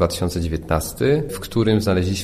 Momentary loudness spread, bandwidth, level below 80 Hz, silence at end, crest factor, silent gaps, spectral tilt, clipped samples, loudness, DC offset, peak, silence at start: 5 LU; 15.5 kHz; -34 dBFS; 0 s; 16 dB; none; -6 dB/octave; under 0.1%; -21 LUFS; under 0.1%; -4 dBFS; 0 s